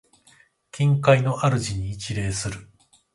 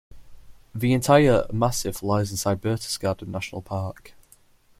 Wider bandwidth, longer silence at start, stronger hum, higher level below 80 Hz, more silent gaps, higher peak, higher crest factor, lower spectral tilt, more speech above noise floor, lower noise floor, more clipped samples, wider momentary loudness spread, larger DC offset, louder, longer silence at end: second, 11.5 kHz vs 16.5 kHz; first, 0.75 s vs 0.1 s; neither; about the same, -46 dBFS vs -48 dBFS; neither; about the same, -2 dBFS vs -4 dBFS; about the same, 22 dB vs 20 dB; about the same, -5.5 dB/octave vs -5.5 dB/octave; about the same, 36 dB vs 34 dB; about the same, -58 dBFS vs -56 dBFS; neither; about the same, 14 LU vs 14 LU; neither; about the same, -23 LUFS vs -23 LUFS; second, 0.5 s vs 0.7 s